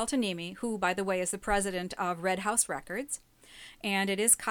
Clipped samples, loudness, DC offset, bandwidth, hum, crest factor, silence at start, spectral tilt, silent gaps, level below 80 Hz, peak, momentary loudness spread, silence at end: under 0.1%; -30 LUFS; under 0.1%; 20 kHz; none; 22 dB; 0 s; -2.5 dB/octave; none; -54 dBFS; -8 dBFS; 11 LU; 0 s